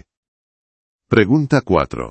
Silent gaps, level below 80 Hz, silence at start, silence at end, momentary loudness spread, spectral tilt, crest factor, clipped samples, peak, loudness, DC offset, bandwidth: none; -42 dBFS; 1.1 s; 0 s; 4 LU; -7.5 dB/octave; 18 dB; under 0.1%; 0 dBFS; -16 LUFS; under 0.1%; 8.6 kHz